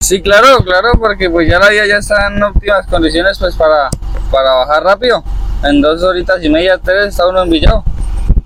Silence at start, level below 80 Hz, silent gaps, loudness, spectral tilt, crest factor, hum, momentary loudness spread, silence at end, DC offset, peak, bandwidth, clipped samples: 0 s; -18 dBFS; none; -10 LUFS; -4.5 dB/octave; 10 dB; none; 8 LU; 0 s; under 0.1%; 0 dBFS; 16 kHz; 0.3%